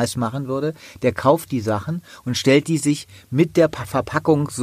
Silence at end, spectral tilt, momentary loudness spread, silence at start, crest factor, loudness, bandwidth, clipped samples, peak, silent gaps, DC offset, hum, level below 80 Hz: 0 s; -5.5 dB/octave; 9 LU; 0 s; 18 dB; -21 LUFS; 15.5 kHz; under 0.1%; -2 dBFS; none; under 0.1%; none; -52 dBFS